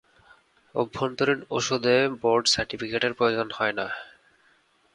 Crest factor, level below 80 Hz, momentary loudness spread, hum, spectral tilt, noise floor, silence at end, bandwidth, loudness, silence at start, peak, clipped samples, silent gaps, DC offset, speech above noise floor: 18 dB; -58 dBFS; 9 LU; none; -3.5 dB/octave; -63 dBFS; 0.85 s; 11 kHz; -25 LUFS; 0.75 s; -8 dBFS; under 0.1%; none; under 0.1%; 38 dB